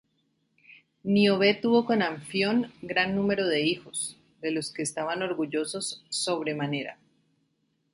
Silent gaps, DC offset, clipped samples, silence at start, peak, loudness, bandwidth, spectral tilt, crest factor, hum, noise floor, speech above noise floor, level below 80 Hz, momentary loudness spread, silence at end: none; under 0.1%; under 0.1%; 0.7 s; -8 dBFS; -27 LUFS; 11.5 kHz; -4 dB/octave; 20 dB; none; -73 dBFS; 47 dB; -68 dBFS; 10 LU; 1 s